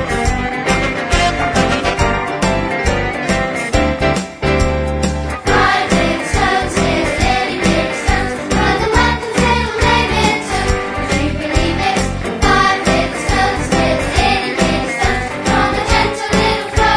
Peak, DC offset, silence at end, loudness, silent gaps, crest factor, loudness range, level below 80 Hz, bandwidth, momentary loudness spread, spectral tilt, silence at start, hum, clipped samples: 0 dBFS; under 0.1%; 0 s; -15 LUFS; none; 14 dB; 1 LU; -24 dBFS; 11 kHz; 5 LU; -4.5 dB/octave; 0 s; none; under 0.1%